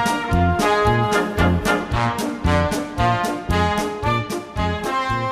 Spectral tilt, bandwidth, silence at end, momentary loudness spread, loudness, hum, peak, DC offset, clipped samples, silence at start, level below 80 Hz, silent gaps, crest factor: -5.5 dB/octave; 15.5 kHz; 0 s; 5 LU; -20 LUFS; none; -4 dBFS; under 0.1%; under 0.1%; 0 s; -32 dBFS; none; 16 dB